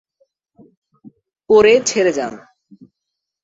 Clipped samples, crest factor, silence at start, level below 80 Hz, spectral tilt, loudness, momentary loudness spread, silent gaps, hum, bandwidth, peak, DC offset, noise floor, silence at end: under 0.1%; 18 dB; 1.5 s; -58 dBFS; -3 dB/octave; -14 LUFS; 14 LU; none; none; 8 kHz; -2 dBFS; under 0.1%; -80 dBFS; 1.05 s